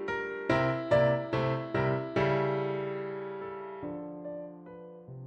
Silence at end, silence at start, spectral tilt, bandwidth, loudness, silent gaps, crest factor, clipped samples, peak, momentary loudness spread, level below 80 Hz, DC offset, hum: 0 s; 0 s; -8 dB/octave; 8.4 kHz; -31 LUFS; none; 18 dB; under 0.1%; -14 dBFS; 17 LU; -58 dBFS; under 0.1%; none